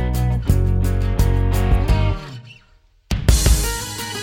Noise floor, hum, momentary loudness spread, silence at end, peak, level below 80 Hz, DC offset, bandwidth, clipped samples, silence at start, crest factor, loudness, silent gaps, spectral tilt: -53 dBFS; none; 10 LU; 0 s; 0 dBFS; -20 dBFS; under 0.1%; 17 kHz; under 0.1%; 0 s; 18 dB; -19 LUFS; none; -5 dB/octave